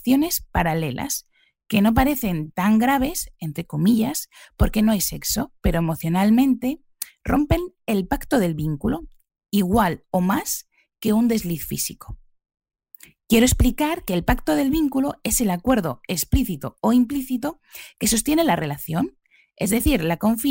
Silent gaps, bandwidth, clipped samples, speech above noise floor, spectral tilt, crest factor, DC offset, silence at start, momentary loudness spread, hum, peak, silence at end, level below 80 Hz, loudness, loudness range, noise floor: none; 16.5 kHz; under 0.1%; 29 dB; -5 dB/octave; 16 dB; under 0.1%; 0.05 s; 10 LU; none; -6 dBFS; 0 s; -34 dBFS; -22 LUFS; 2 LU; -50 dBFS